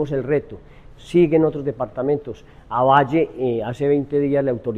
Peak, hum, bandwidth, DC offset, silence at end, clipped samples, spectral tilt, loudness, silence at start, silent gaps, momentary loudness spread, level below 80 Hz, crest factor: -2 dBFS; none; 9.6 kHz; under 0.1%; 0 s; under 0.1%; -8.5 dB/octave; -20 LUFS; 0 s; none; 10 LU; -48 dBFS; 18 dB